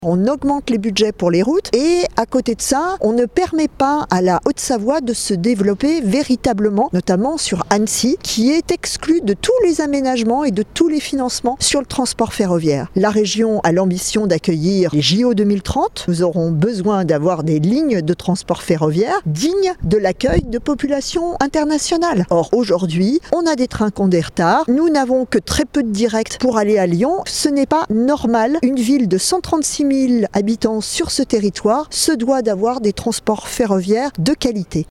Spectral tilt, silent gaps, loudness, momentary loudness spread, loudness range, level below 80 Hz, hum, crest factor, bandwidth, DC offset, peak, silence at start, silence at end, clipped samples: -5 dB/octave; none; -16 LUFS; 4 LU; 1 LU; -40 dBFS; none; 16 dB; 16 kHz; under 0.1%; 0 dBFS; 0 s; 0.05 s; under 0.1%